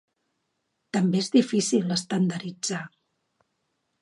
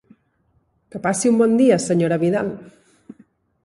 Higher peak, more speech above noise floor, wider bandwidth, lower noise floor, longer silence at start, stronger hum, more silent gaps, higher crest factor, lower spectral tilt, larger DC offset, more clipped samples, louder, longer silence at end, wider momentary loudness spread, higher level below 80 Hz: second, -8 dBFS vs -4 dBFS; first, 53 dB vs 47 dB; about the same, 11.5 kHz vs 11.5 kHz; first, -77 dBFS vs -64 dBFS; about the same, 0.95 s vs 0.95 s; neither; neither; about the same, 20 dB vs 16 dB; about the same, -5 dB/octave vs -6 dB/octave; neither; neither; second, -25 LUFS vs -18 LUFS; first, 1.15 s vs 0.95 s; second, 9 LU vs 14 LU; second, -74 dBFS vs -62 dBFS